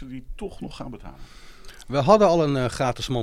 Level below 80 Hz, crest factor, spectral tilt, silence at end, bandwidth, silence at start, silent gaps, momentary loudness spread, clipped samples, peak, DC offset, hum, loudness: -42 dBFS; 20 dB; -6 dB/octave; 0 s; 14.5 kHz; 0 s; none; 22 LU; under 0.1%; -2 dBFS; under 0.1%; none; -20 LUFS